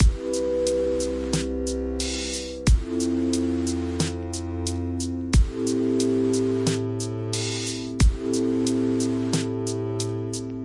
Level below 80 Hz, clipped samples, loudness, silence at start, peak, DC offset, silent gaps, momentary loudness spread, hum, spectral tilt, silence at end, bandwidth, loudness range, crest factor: -30 dBFS; under 0.1%; -25 LUFS; 0 s; -8 dBFS; under 0.1%; none; 6 LU; none; -5.5 dB/octave; 0 s; 11.5 kHz; 2 LU; 16 dB